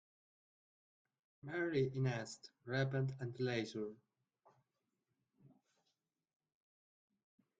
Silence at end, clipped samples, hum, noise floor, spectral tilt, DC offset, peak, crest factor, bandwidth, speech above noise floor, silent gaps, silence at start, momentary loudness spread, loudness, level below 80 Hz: 2.1 s; under 0.1%; none; -88 dBFS; -6.5 dB/octave; under 0.1%; -24 dBFS; 20 dB; 8.6 kHz; 48 dB; none; 1.45 s; 12 LU; -41 LUFS; -80 dBFS